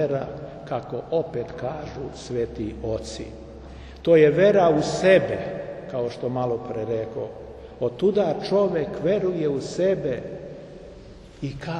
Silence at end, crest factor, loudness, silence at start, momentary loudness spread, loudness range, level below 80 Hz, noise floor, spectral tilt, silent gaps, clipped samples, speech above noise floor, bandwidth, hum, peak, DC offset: 0 s; 20 dB; -23 LUFS; 0 s; 21 LU; 9 LU; -48 dBFS; -44 dBFS; -6.5 dB/octave; none; under 0.1%; 21 dB; 10 kHz; none; -4 dBFS; under 0.1%